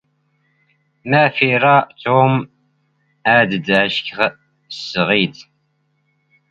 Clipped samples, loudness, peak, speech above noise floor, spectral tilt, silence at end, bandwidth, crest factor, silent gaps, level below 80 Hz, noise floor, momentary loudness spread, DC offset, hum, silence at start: under 0.1%; -15 LUFS; 0 dBFS; 50 dB; -6.5 dB/octave; 1.1 s; 7.8 kHz; 18 dB; none; -58 dBFS; -65 dBFS; 11 LU; under 0.1%; none; 1.05 s